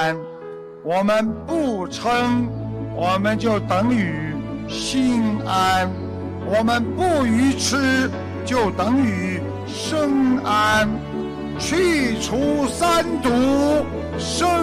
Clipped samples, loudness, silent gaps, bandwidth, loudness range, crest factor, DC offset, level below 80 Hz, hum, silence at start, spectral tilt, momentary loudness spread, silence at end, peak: under 0.1%; -20 LUFS; none; 15 kHz; 2 LU; 12 dB; under 0.1%; -42 dBFS; none; 0 s; -5 dB/octave; 10 LU; 0 s; -8 dBFS